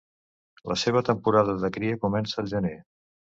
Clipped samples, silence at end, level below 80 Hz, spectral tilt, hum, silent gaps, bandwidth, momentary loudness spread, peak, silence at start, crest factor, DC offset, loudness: under 0.1%; 0.45 s; -54 dBFS; -6 dB/octave; none; none; 8 kHz; 9 LU; -8 dBFS; 0.65 s; 20 dB; under 0.1%; -26 LUFS